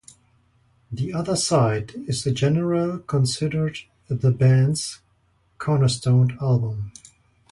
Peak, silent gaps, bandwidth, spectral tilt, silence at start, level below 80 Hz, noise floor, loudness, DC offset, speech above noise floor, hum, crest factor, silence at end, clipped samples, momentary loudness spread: -6 dBFS; none; 11.5 kHz; -6 dB/octave; 0.9 s; -52 dBFS; -63 dBFS; -22 LUFS; under 0.1%; 42 dB; none; 16 dB; 0.6 s; under 0.1%; 12 LU